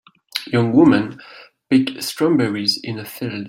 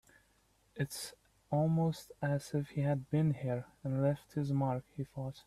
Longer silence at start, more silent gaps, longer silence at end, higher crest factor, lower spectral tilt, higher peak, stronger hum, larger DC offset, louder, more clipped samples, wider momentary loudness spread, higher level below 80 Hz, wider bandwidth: second, 0.35 s vs 0.75 s; neither; about the same, 0 s vs 0.05 s; about the same, 16 dB vs 16 dB; second, -5.5 dB/octave vs -7.5 dB/octave; first, -2 dBFS vs -20 dBFS; neither; neither; first, -18 LUFS vs -36 LUFS; neither; first, 15 LU vs 10 LU; first, -58 dBFS vs -66 dBFS; first, 16.5 kHz vs 14 kHz